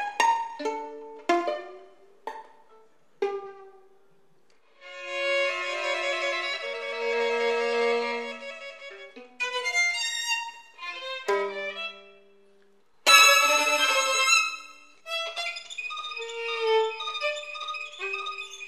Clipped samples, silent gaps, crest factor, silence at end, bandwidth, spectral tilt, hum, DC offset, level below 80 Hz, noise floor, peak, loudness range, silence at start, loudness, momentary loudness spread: under 0.1%; none; 24 dB; 0 s; 15 kHz; 1.5 dB/octave; none; 0.1%; -88 dBFS; -65 dBFS; -4 dBFS; 13 LU; 0 s; -25 LUFS; 19 LU